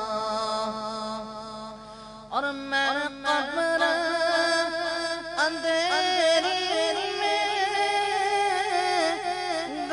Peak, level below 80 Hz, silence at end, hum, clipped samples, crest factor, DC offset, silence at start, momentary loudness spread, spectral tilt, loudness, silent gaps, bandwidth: -12 dBFS; -60 dBFS; 0 s; none; under 0.1%; 16 dB; under 0.1%; 0 s; 10 LU; -1.5 dB/octave; -25 LUFS; none; 11 kHz